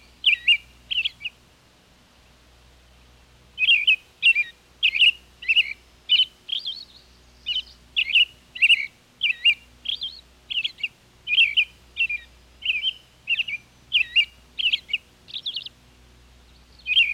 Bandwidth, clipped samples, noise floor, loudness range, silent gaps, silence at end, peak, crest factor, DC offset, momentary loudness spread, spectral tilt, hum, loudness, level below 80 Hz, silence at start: 15.5 kHz; under 0.1%; -56 dBFS; 5 LU; none; 0 s; -8 dBFS; 16 dB; under 0.1%; 16 LU; 1 dB/octave; none; -21 LUFS; -58 dBFS; 0.25 s